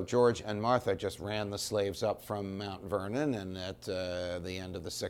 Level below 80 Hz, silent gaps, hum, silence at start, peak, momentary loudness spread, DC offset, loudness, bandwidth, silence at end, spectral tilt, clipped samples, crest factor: -60 dBFS; none; none; 0 s; -14 dBFS; 10 LU; under 0.1%; -34 LUFS; 17 kHz; 0 s; -5 dB/octave; under 0.1%; 20 dB